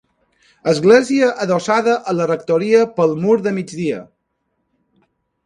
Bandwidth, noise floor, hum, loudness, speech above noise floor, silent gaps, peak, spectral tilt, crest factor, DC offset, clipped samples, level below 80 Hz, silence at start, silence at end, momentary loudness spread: 11 kHz; -70 dBFS; none; -16 LUFS; 55 dB; none; 0 dBFS; -6 dB/octave; 18 dB; under 0.1%; under 0.1%; -62 dBFS; 0.65 s; 1.45 s; 11 LU